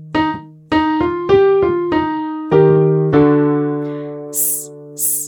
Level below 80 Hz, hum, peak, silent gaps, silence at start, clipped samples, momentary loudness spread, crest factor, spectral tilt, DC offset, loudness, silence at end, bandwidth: -44 dBFS; none; 0 dBFS; none; 0 s; under 0.1%; 11 LU; 14 dB; -5.5 dB/octave; under 0.1%; -15 LUFS; 0 s; over 20 kHz